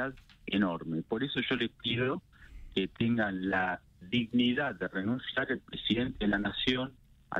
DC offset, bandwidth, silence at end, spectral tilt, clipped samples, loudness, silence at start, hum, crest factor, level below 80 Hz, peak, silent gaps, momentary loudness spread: under 0.1%; 7.2 kHz; 0 s; -7 dB/octave; under 0.1%; -32 LUFS; 0 s; none; 18 dB; -54 dBFS; -14 dBFS; none; 6 LU